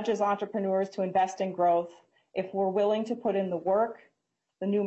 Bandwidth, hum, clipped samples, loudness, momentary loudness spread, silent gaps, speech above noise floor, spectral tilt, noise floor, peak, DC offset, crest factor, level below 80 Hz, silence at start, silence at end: 8.2 kHz; none; under 0.1%; -29 LUFS; 8 LU; none; 53 dB; -6.5 dB/octave; -81 dBFS; -14 dBFS; under 0.1%; 14 dB; -76 dBFS; 0 s; 0 s